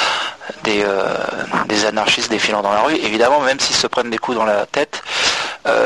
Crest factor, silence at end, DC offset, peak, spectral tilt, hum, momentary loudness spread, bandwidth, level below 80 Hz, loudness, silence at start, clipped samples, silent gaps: 16 dB; 0 s; 0.1%; -2 dBFS; -2 dB/octave; none; 6 LU; 12 kHz; -52 dBFS; -17 LUFS; 0 s; under 0.1%; none